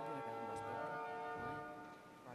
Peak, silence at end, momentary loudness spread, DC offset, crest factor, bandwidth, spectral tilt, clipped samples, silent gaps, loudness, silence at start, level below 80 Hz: -34 dBFS; 0 s; 10 LU; under 0.1%; 14 dB; 13.5 kHz; -5.5 dB/octave; under 0.1%; none; -47 LUFS; 0 s; -76 dBFS